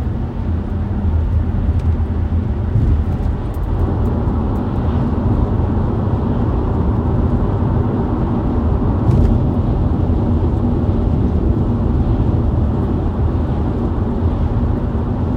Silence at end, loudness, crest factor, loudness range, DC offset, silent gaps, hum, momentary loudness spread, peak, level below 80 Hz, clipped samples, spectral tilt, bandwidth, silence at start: 0 s; -18 LUFS; 14 dB; 2 LU; under 0.1%; none; none; 3 LU; 0 dBFS; -20 dBFS; under 0.1%; -10.5 dB/octave; 4.7 kHz; 0 s